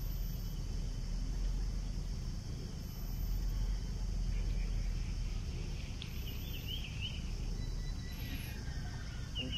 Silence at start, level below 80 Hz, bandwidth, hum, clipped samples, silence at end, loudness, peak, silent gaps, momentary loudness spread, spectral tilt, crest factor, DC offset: 0 s; -40 dBFS; 13 kHz; none; under 0.1%; 0 s; -42 LUFS; -26 dBFS; none; 4 LU; -5 dB/octave; 12 dB; under 0.1%